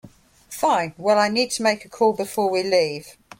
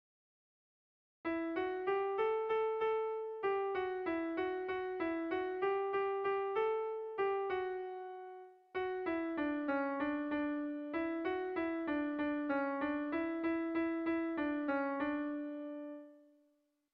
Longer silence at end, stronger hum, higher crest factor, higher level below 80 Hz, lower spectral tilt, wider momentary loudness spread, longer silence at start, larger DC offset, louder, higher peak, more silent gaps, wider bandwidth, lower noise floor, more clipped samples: second, 0.3 s vs 0.75 s; neither; about the same, 16 dB vs 14 dB; first, -64 dBFS vs -72 dBFS; about the same, -3.5 dB/octave vs -3 dB/octave; about the same, 6 LU vs 7 LU; second, 0.05 s vs 1.25 s; neither; first, -21 LUFS vs -38 LUFS; first, -6 dBFS vs -24 dBFS; neither; first, 17 kHz vs 5.4 kHz; second, -46 dBFS vs -77 dBFS; neither